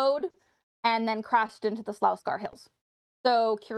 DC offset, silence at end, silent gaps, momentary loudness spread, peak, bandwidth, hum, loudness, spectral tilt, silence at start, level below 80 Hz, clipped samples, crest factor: under 0.1%; 0 s; 0.63-0.83 s, 2.81-3.24 s; 9 LU; -10 dBFS; 12.5 kHz; none; -28 LUFS; -5 dB/octave; 0 s; -76 dBFS; under 0.1%; 18 dB